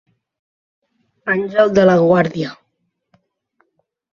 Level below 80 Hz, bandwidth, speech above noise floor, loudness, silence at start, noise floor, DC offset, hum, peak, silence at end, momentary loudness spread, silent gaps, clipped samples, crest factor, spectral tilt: -56 dBFS; 7.2 kHz; 57 dB; -15 LUFS; 1.25 s; -71 dBFS; under 0.1%; none; 0 dBFS; 1.6 s; 15 LU; none; under 0.1%; 18 dB; -7 dB/octave